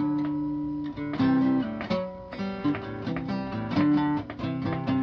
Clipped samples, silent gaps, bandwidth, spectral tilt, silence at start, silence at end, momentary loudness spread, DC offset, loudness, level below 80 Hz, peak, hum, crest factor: under 0.1%; none; 6.2 kHz; -8.5 dB/octave; 0 s; 0 s; 9 LU; under 0.1%; -28 LUFS; -52 dBFS; -14 dBFS; none; 14 dB